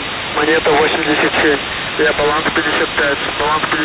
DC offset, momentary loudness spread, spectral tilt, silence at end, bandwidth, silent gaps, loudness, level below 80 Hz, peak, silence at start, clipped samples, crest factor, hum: under 0.1%; 4 LU; -8 dB/octave; 0 s; 4 kHz; none; -14 LUFS; -40 dBFS; -4 dBFS; 0 s; under 0.1%; 12 dB; none